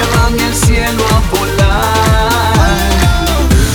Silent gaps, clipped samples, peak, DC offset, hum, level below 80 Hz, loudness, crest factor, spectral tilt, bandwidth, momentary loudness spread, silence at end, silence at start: none; under 0.1%; 0 dBFS; under 0.1%; none; -14 dBFS; -11 LUFS; 10 dB; -4.5 dB/octave; over 20 kHz; 2 LU; 0 s; 0 s